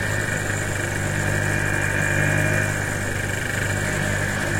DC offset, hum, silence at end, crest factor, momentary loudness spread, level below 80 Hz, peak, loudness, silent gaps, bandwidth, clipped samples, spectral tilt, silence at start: under 0.1%; 50 Hz at -30 dBFS; 0 s; 16 dB; 4 LU; -38 dBFS; -8 dBFS; -22 LUFS; none; 16.5 kHz; under 0.1%; -4.5 dB/octave; 0 s